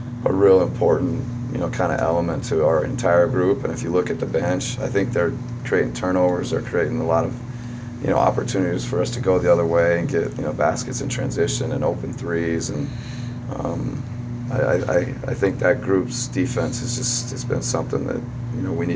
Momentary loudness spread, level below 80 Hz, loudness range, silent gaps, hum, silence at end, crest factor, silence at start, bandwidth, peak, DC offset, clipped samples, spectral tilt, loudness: 10 LU; -42 dBFS; 4 LU; none; none; 0 s; 18 dB; 0 s; 8 kHz; -2 dBFS; under 0.1%; under 0.1%; -5.5 dB/octave; -22 LUFS